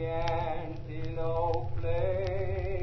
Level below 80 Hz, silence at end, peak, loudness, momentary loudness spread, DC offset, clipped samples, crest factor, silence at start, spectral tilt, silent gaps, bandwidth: -40 dBFS; 0 s; -16 dBFS; -33 LUFS; 7 LU; under 0.1%; under 0.1%; 14 dB; 0 s; -8 dB/octave; none; 6.2 kHz